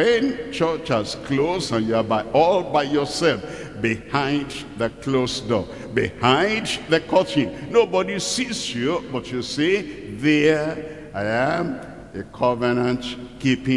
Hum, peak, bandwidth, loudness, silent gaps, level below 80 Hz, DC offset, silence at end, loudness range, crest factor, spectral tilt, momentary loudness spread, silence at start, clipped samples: none; -2 dBFS; 12 kHz; -22 LUFS; none; -50 dBFS; 0.2%; 0 s; 2 LU; 18 dB; -5 dB/octave; 10 LU; 0 s; under 0.1%